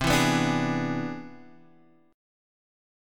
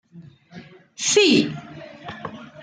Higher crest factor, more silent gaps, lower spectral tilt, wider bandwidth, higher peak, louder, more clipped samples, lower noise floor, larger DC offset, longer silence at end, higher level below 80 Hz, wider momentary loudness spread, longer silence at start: about the same, 20 dB vs 20 dB; neither; first, -4.5 dB/octave vs -3 dB/octave; first, 17.5 kHz vs 9.8 kHz; second, -10 dBFS vs -4 dBFS; second, -26 LUFS vs -18 LUFS; neither; first, -59 dBFS vs -46 dBFS; neither; first, 1 s vs 0.2 s; first, -50 dBFS vs -66 dBFS; second, 18 LU vs 22 LU; second, 0 s vs 0.15 s